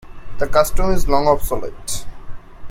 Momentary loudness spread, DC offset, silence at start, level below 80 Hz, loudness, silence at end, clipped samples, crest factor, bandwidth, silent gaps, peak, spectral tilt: 11 LU; under 0.1%; 0.05 s; -26 dBFS; -20 LUFS; 0 s; under 0.1%; 16 dB; 16 kHz; none; 0 dBFS; -4.5 dB/octave